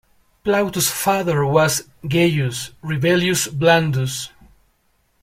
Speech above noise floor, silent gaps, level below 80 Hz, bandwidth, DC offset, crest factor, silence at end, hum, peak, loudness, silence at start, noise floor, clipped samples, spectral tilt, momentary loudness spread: 45 dB; none; -52 dBFS; 16.5 kHz; under 0.1%; 18 dB; 0.95 s; none; -2 dBFS; -19 LUFS; 0.45 s; -63 dBFS; under 0.1%; -4.5 dB/octave; 10 LU